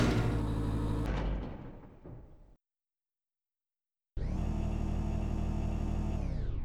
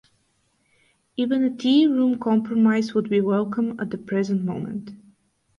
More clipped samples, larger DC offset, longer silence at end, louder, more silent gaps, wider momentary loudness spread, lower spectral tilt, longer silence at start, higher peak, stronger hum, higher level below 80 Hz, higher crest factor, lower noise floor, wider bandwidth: neither; neither; second, 0 s vs 0.6 s; second, -36 LUFS vs -22 LUFS; neither; first, 17 LU vs 12 LU; about the same, -7.5 dB/octave vs -7 dB/octave; second, 0 s vs 1.2 s; second, -16 dBFS vs -8 dBFS; neither; first, -38 dBFS vs -66 dBFS; about the same, 18 dB vs 14 dB; first, under -90 dBFS vs -67 dBFS; first, 11.5 kHz vs 7.2 kHz